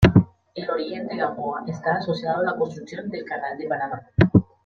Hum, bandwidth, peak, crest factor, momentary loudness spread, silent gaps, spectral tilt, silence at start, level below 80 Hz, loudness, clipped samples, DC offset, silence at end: none; 7.2 kHz; -2 dBFS; 20 dB; 13 LU; none; -8.5 dB/octave; 0 s; -42 dBFS; -25 LUFS; under 0.1%; under 0.1%; 0.2 s